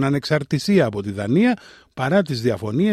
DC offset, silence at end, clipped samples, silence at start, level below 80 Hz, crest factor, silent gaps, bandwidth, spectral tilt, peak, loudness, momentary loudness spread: under 0.1%; 0 s; under 0.1%; 0 s; -56 dBFS; 14 dB; none; 13.5 kHz; -6.5 dB/octave; -4 dBFS; -20 LUFS; 9 LU